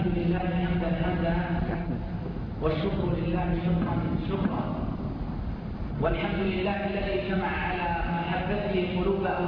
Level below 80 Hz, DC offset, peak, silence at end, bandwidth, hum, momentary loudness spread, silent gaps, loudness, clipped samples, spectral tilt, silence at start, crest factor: -38 dBFS; under 0.1%; -12 dBFS; 0 s; 5.4 kHz; none; 7 LU; none; -29 LUFS; under 0.1%; -10 dB/octave; 0 s; 16 dB